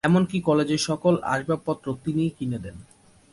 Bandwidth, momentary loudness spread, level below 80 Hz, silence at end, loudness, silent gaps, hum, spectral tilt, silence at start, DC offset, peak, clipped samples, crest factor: 11.5 kHz; 9 LU; -54 dBFS; 0.5 s; -25 LUFS; none; none; -6 dB/octave; 0.05 s; under 0.1%; -8 dBFS; under 0.1%; 16 dB